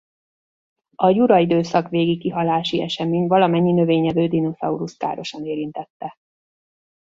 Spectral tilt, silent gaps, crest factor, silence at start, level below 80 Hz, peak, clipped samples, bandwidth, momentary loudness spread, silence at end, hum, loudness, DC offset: -7.5 dB/octave; 5.90-6.00 s; 18 dB; 1 s; -60 dBFS; -2 dBFS; under 0.1%; 7.6 kHz; 12 LU; 1.05 s; none; -19 LUFS; under 0.1%